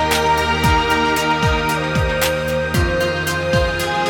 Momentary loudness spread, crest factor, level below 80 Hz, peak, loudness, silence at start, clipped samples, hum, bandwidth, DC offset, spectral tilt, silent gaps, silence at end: 3 LU; 14 dB; -28 dBFS; -2 dBFS; -17 LUFS; 0 s; under 0.1%; none; 19 kHz; under 0.1%; -4.5 dB/octave; none; 0 s